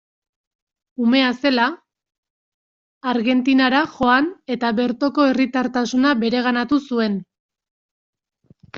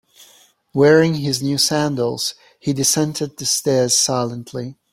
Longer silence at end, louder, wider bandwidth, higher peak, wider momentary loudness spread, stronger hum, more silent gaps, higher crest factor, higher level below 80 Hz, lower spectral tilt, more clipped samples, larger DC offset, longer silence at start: second, 0 s vs 0.2 s; about the same, -19 LUFS vs -17 LUFS; second, 7.2 kHz vs 16.5 kHz; about the same, -4 dBFS vs -2 dBFS; second, 7 LU vs 13 LU; neither; first, 2.18-2.23 s, 2.30-3.01 s, 7.40-7.49 s, 7.71-8.13 s vs none; about the same, 18 dB vs 18 dB; about the same, -60 dBFS vs -58 dBFS; about the same, -2.5 dB/octave vs -3.5 dB/octave; neither; neither; first, 1 s vs 0.2 s